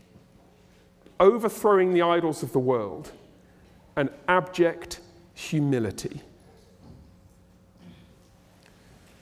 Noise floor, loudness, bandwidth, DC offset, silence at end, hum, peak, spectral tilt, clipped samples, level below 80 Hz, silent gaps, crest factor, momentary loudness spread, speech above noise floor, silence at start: -57 dBFS; -24 LUFS; 16 kHz; under 0.1%; 1.3 s; none; -6 dBFS; -6 dB/octave; under 0.1%; -60 dBFS; none; 20 dB; 19 LU; 33 dB; 1.2 s